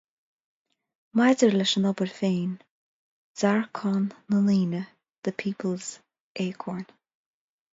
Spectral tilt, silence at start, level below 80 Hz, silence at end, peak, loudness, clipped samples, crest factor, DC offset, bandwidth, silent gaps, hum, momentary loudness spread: -5.5 dB/octave; 1.15 s; -72 dBFS; 0.9 s; -6 dBFS; -26 LUFS; under 0.1%; 20 dB; under 0.1%; 7.8 kHz; 2.71-3.35 s, 5.18-5.22 s, 6.20-6.35 s; none; 17 LU